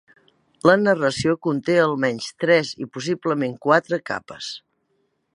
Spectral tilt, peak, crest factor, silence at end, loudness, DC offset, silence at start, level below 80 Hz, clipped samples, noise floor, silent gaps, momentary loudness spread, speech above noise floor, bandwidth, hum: -5.5 dB/octave; 0 dBFS; 20 dB; 0.75 s; -21 LUFS; under 0.1%; 0.65 s; -60 dBFS; under 0.1%; -69 dBFS; none; 13 LU; 49 dB; 11 kHz; none